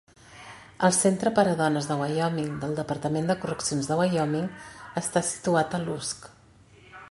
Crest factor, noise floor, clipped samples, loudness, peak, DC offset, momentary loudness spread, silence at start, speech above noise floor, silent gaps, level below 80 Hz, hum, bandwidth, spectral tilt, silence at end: 20 dB; -55 dBFS; under 0.1%; -26 LUFS; -6 dBFS; under 0.1%; 12 LU; 0.3 s; 29 dB; none; -60 dBFS; none; 11.5 kHz; -4.5 dB/octave; 0 s